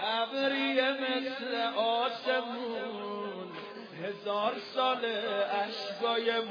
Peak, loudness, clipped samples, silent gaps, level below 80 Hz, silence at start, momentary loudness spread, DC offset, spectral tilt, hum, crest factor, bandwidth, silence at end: -14 dBFS; -32 LUFS; under 0.1%; none; under -90 dBFS; 0 s; 11 LU; under 0.1%; -4.5 dB/octave; none; 18 dB; 5.4 kHz; 0 s